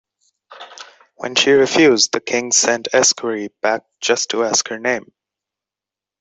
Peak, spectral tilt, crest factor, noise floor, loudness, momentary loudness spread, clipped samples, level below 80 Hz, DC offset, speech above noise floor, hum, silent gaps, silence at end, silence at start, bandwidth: 0 dBFS; -1.5 dB/octave; 18 dB; -88 dBFS; -16 LUFS; 11 LU; under 0.1%; -62 dBFS; under 0.1%; 72 dB; none; none; 1.2 s; 0.5 s; 8.4 kHz